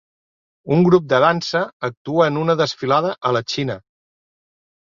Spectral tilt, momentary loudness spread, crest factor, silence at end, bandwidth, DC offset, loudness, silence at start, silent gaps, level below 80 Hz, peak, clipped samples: -6 dB/octave; 11 LU; 18 dB; 1.05 s; 7.4 kHz; under 0.1%; -18 LUFS; 0.65 s; 1.73-1.80 s, 1.97-2.05 s; -58 dBFS; -2 dBFS; under 0.1%